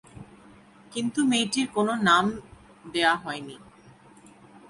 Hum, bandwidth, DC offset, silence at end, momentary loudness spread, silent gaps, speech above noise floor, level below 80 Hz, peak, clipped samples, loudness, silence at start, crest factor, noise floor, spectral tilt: none; 11.5 kHz; under 0.1%; 1.15 s; 16 LU; none; 28 dB; -62 dBFS; -6 dBFS; under 0.1%; -25 LUFS; 0.15 s; 22 dB; -53 dBFS; -3.5 dB/octave